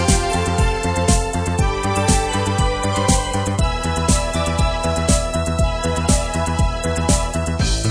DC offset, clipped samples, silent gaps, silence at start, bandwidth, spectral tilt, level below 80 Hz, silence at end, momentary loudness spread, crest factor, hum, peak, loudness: under 0.1%; under 0.1%; none; 0 s; 10.5 kHz; -4.5 dB/octave; -22 dBFS; 0 s; 3 LU; 16 dB; none; -2 dBFS; -19 LUFS